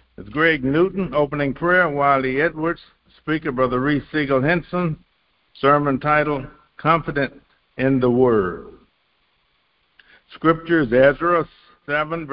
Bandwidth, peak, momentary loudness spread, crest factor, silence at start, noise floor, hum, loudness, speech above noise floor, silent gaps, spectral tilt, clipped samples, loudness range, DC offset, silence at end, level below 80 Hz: 5.4 kHz; -2 dBFS; 11 LU; 18 dB; 0.2 s; -65 dBFS; none; -19 LUFS; 46 dB; none; -11 dB/octave; under 0.1%; 3 LU; under 0.1%; 0 s; -48 dBFS